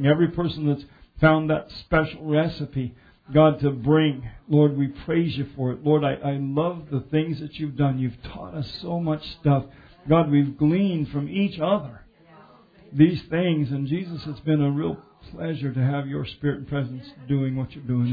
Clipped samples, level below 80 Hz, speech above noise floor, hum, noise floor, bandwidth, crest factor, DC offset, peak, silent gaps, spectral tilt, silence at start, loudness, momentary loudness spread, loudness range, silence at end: under 0.1%; -48 dBFS; 29 dB; none; -51 dBFS; 5 kHz; 22 dB; under 0.1%; -2 dBFS; none; -10 dB/octave; 0 s; -24 LUFS; 12 LU; 5 LU; 0 s